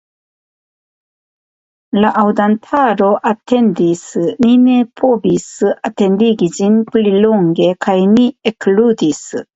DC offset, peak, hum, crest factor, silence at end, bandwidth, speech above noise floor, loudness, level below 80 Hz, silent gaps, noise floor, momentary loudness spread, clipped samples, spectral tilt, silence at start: under 0.1%; 0 dBFS; none; 12 dB; 0.15 s; 8 kHz; over 78 dB; -13 LUFS; -56 dBFS; none; under -90 dBFS; 6 LU; under 0.1%; -6.5 dB/octave; 1.95 s